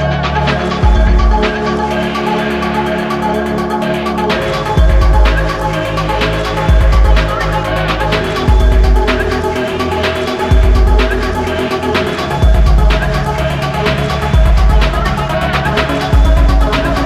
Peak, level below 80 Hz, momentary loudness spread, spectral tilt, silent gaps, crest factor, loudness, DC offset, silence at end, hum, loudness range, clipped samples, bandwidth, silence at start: 0 dBFS; -14 dBFS; 5 LU; -6 dB/octave; none; 10 dB; -13 LUFS; under 0.1%; 0 s; none; 1 LU; under 0.1%; 13 kHz; 0 s